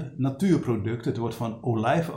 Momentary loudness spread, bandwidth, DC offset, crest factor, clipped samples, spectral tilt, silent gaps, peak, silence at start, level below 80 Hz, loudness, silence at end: 7 LU; 17 kHz; under 0.1%; 16 dB; under 0.1%; -7.5 dB/octave; none; -10 dBFS; 0 s; -58 dBFS; -26 LUFS; 0 s